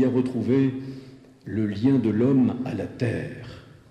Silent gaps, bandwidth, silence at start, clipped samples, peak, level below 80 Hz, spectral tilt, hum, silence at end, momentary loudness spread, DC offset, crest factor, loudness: none; 9.2 kHz; 0 s; under 0.1%; -10 dBFS; -60 dBFS; -9 dB/octave; none; 0.3 s; 19 LU; under 0.1%; 14 dB; -24 LUFS